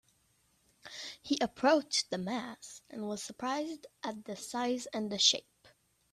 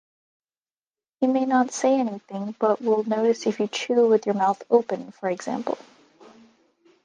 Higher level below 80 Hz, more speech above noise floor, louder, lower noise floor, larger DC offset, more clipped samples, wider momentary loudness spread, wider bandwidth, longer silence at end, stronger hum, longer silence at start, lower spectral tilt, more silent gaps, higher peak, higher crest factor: about the same, -76 dBFS vs -78 dBFS; second, 38 dB vs over 67 dB; second, -33 LUFS vs -23 LUFS; second, -72 dBFS vs under -90 dBFS; neither; neither; first, 17 LU vs 10 LU; first, 14 kHz vs 9.8 kHz; second, 0.45 s vs 1.3 s; neither; second, 0.85 s vs 1.2 s; second, -2.5 dB/octave vs -5 dB/octave; neither; second, -10 dBFS vs -4 dBFS; first, 26 dB vs 20 dB